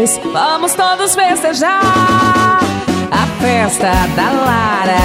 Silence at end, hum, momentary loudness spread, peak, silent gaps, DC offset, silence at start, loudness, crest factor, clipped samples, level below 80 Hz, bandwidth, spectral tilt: 0 s; none; 4 LU; 0 dBFS; none; under 0.1%; 0 s; -12 LUFS; 12 dB; under 0.1%; -32 dBFS; 16.5 kHz; -3.5 dB/octave